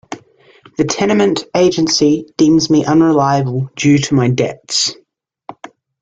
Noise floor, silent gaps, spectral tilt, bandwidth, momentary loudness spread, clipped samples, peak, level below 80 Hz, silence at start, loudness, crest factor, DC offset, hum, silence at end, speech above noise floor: -46 dBFS; none; -5 dB/octave; 9.2 kHz; 11 LU; under 0.1%; -2 dBFS; -50 dBFS; 0.1 s; -13 LUFS; 12 dB; under 0.1%; none; 0.5 s; 33 dB